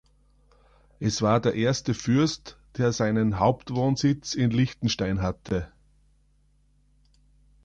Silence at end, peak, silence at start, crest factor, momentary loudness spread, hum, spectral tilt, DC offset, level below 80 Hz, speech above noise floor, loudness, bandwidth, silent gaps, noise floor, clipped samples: 1.95 s; -8 dBFS; 1 s; 18 dB; 8 LU; 50 Hz at -50 dBFS; -6 dB/octave; under 0.1%; -48 dBFS; 39 dB; -25 LUFS; 9 kHz; none; -63 dBFS; under 0.1%